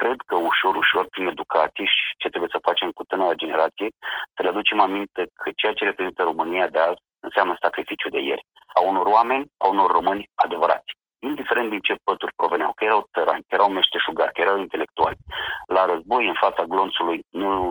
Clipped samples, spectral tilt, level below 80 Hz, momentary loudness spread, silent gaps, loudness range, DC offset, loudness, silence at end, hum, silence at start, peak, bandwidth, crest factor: under 0.1%; -4.5 dB/octave; -58 dBFS; 9 LU; none; 2 LU; under 0.1%; -22 LUFS; 0 s; none; 0 s; -4 dBFS; over 20 kHz; 20 dB